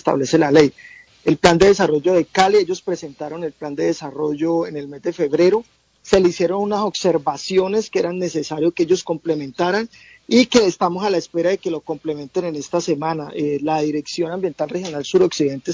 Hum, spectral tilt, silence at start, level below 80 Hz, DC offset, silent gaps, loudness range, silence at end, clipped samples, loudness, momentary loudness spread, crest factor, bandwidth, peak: none; -5 dB/octave; 0.05 s; -50 dBFS; under 0.1%; none; 5 LU; 0 s; under 0.1%; -19 LUFS; 11 LU; 18 dB; 8 kHz; 0 dBFS